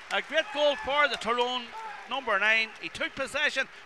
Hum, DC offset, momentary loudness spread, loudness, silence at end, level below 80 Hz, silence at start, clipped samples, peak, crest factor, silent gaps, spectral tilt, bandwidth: none; 0.1%; 10 LU; -27 LUFS; 0 s; -62 dBFS; 0 s; under 0.1%; -12 dBFS; 18 dB; none; -1.5 dB/octave; 12.5 kHz